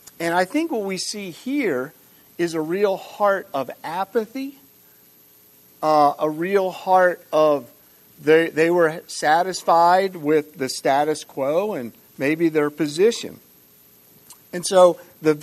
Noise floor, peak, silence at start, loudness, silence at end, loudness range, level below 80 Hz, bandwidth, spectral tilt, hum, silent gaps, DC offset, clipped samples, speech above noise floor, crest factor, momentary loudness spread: -52 dBFS; -2 dBFS; 0.2 s; -21 LUFS; 0 s; 6 LU; -72 dBFS; 13.5 kHz; -4.5 dB/octave; none; none; under 0.1%; under 0.1%; 32 dB; 20 dB; 11 LU